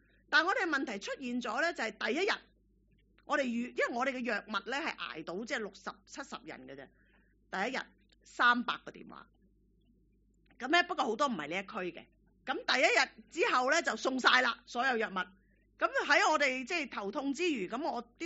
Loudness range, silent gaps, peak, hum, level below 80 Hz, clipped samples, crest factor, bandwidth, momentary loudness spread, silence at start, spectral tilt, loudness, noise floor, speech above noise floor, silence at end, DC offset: 8 LU; none; -10 dBFS; none; -72 dBFS; under 0.1%; 24 dB; 8 kHz; 18 LU; 0.3 s; 0 dB/octave; -32 LUFS; -69 dBFS; 36 dB; 0 s; under 0.1%